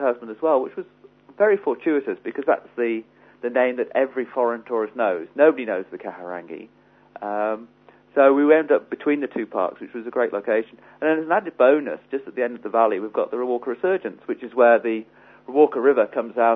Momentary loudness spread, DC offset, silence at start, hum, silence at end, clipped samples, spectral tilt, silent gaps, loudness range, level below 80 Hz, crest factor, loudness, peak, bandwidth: 15 LU; under 0.1%; 0 s; 50 Hz at -65 dBFS; 0 s; under 0.1%; -8.5 dB/octave; none; 3 LU; -74 dBFS; 18 dB; -22 LUFS; -4 dBFS; 3.9 kHz